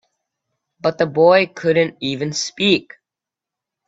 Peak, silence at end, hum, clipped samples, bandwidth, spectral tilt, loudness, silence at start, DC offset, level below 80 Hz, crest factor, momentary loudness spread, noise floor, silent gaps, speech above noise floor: 0 dBFS; 1.05 s; none; under 0.1%; 8 kHz; -4.5 dB/octave; -17 LUFS; 0.85 s; under 0.1%; -60 dBFS; 20 dB; 10 LU; -87 dBFS; none; 70 dB